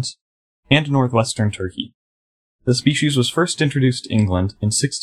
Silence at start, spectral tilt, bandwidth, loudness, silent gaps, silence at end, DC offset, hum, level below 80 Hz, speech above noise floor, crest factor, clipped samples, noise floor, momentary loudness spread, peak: 0 s; -5 dB/octave; 13.5 kHz; -19 LUFS; 0.21-0.63 s, 1.94-2.59 s; 0 s; under 0.1%; none; -50 dBFS; over 72 dB; 18 dB; under 0.1%; under -90 dBFS; 10 LU; 0 dBFS